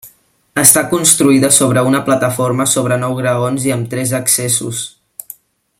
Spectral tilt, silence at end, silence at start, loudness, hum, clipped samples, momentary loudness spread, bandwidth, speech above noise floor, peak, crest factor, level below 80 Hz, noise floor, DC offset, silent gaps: -3.5 dB/octave; 0.9 s; 0.05 s; -12 LUFS; none; 0.2%; 14 LU; over 20 kHz; 35 dB; 0 dBFS; 14 dB; -54 dBFS; -48 dBFS; under 0.1%; none